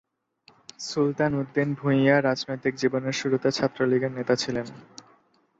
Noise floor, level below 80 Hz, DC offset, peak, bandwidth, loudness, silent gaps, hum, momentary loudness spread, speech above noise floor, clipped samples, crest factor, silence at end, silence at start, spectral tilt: -62 dBFS; -64 dBFS; under 0.1%; -6 dBFS; 8 kHz; -25 LUFS; none; none; 10 LU; 37 dB; under 0.1%; 20 dB; 0.75 s; 0.8 s; -5.5 dB/octave